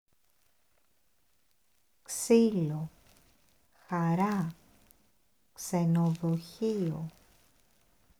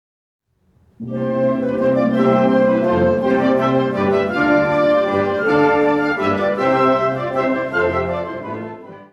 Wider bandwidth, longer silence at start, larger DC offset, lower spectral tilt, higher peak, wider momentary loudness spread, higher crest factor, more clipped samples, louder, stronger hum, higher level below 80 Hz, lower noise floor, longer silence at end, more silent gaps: first, 16 kHz vs 8.2 kHz; first, 2.1 s vs 1 s; neither; second, -6.5 dB/octave vs -8 dB/octave; second, -12 dBFS vs -2 dBFS; first, 15 LU vs 10 LU; first, 20 dB vs 14 dB; neither; second, -30 LUFS vs -17 LUFS; neither; second, -68 dBFS vs -50 dBFS; first, -74 dBFS vs -57 dBFS; first, 1.1 s vs 0.1 s; neither